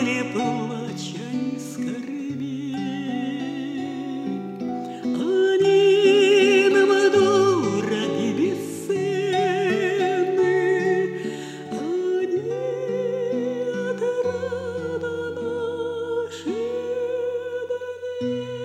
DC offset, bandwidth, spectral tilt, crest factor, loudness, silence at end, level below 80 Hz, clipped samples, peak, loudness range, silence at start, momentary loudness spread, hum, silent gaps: under 0.1%; 12.5 kHz; -5 dB/octave; 16 dB; -23 LUFS; 0 s; -70 dBFS; under 0.1%; -6 dBFS; 11 LU; 0 s; 13 LU; none; none